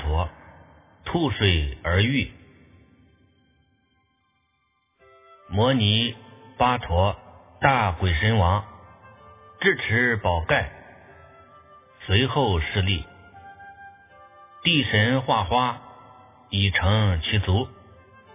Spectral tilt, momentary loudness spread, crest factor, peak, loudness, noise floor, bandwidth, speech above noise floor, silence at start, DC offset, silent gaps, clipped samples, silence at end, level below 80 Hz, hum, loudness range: -9.5 dB/octave; 15 LU; 24 dB; -2 dBFS; -22 LUFS; -70 dBFS; 3.8 kHz; 49 dB; 0 s; under 0.1%; none; under 0.1%; 0.6 s; -36 dBFS; none; 4 LU